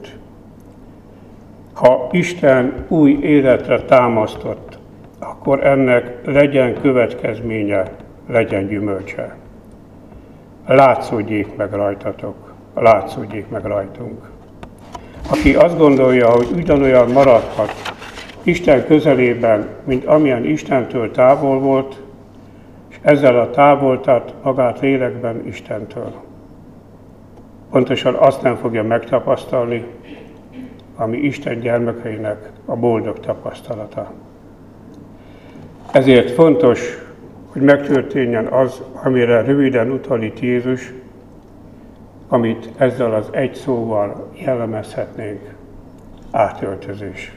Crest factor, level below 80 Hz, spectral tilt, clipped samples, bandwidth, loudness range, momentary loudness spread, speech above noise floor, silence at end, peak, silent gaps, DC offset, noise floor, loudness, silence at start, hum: 16 dB; -42 dBFS; -7.5 dB/octave; under 0.1%; 12.5 kHz; 8 LU; 18 LU; 26 dB; 0.05 s; 0 dBFS; none; 0.1%; -41 dBFS; -15 LUFS; 0 s; none